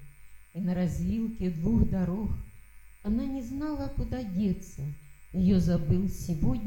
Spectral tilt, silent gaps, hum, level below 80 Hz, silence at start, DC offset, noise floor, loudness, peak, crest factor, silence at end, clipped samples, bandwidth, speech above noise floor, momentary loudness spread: -8.5 dB/octave; none; none; -38 dBFS; 0 s; under 0.1%; -49 dBFS; -30 LUFS; -14 dBFS; 16 dB; 0 s; under 0.1%; 16.5 kHz; 21 dB; 14 LU